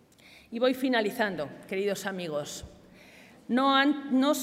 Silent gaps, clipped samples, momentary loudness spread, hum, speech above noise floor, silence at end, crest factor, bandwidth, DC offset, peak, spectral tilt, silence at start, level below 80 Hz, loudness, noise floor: none; under 0.1%; 15 LU; none; 28 dB; 0 s; 18 dB; 16 kHz; under 0.1%; -10 dBFS; -4 dB/octave; 0.5 s; -64 dBFS; -28 LUFS; -56 dBFS